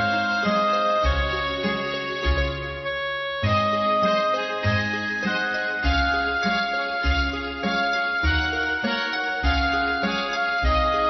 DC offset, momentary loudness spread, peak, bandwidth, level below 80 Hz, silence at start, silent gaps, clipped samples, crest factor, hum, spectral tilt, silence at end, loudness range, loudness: under 0.1%; 5 LU; -10 dBFS; 6.2 kHz; -32 dBFS; 0 s; none; under 0.1%; 14 dB; none; -5.5 dB/octave; 0 s; 1 LU; -23 LUFS